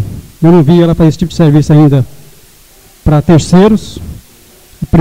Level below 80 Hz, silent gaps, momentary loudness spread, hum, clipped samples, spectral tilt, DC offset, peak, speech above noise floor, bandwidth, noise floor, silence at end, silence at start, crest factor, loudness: -28 dBFS; none; 17 LU; none; 0.2%; -8 dB/octave; under 0.1%; 0 dBFS; 34 dB; 15.5 kHz; -40 dBFS; 0 s; 0 s; 8 dB; -8 LUFS